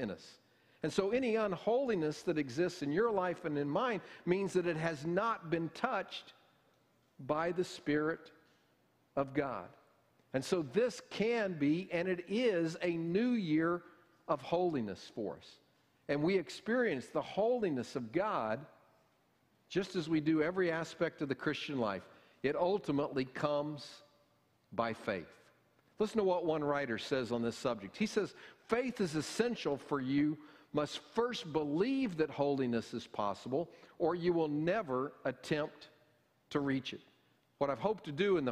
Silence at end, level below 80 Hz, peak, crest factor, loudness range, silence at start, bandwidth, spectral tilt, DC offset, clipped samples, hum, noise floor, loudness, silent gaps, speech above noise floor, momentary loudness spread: 0 s; -70 dBFS; -16 dBFS; 20 dB; 4 LU; 0 s; 13.5 kHz; -6 dB/octave; under 0.1%; under 0.1%; none; -73 dBFS; -36 LUFS; none; 38 dB; 8 LU